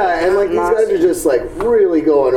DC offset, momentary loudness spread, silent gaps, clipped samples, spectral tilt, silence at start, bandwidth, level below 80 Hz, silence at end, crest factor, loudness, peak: under 0.1%; 3 LU; none; under 0.1%; -5 dB/octave; 0 s; 17 kHz; -40 dBFS; 0 s; 10 dB; -14 LUFS; -2 dBFS